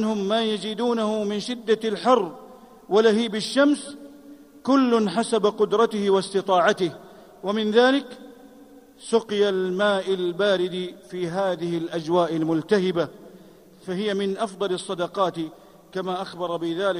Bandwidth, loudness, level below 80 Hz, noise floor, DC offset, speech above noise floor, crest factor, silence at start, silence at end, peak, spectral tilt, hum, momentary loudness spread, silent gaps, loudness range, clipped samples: 15 kHz; -23 LUFS; -68 dBFS; -49 dBFS; under 0.1%; 26 dB; 18 dB; 0 s; 0 s; -4 dBFS; -5 dB/octave; none; 13 LU; none; 4 LU; under 0.1%